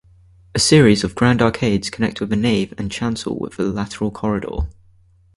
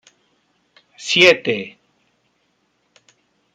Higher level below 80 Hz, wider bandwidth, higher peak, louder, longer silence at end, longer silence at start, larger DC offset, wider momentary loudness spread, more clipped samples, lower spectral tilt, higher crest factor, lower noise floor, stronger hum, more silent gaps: first, -36 dBFS vs -68 dBFS; second, 11.5 kHz vs 14 kHz; about the same, 0 dBFS vs 0 dBFS; second, -18 LUFS vs -14 LUFS; second, 0.65 s vs 1.85 s; second, 0.55 s vs 1 s; neither; second, 13 LU vs 21 LU; neither; first, -5 dB/octave vs -3 dB/octave; about the same, 18 dB vs 22 dB; second, -52 dBFS vs -66 dBFS; second, none vs 60 Hz at -55 dBFS; neither